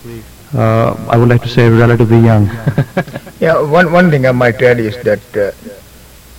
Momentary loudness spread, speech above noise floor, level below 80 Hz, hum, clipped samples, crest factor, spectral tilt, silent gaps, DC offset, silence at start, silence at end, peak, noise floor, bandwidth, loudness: 11 LU; 27 dB; -36 dBFS; none; 0.3%; 10 dB; -8 dB/octave; none; under 0.1%; 0.05 s; 0.65 s; 0 dBFS; -37 dBFS; 16 kHz; -11 LUFS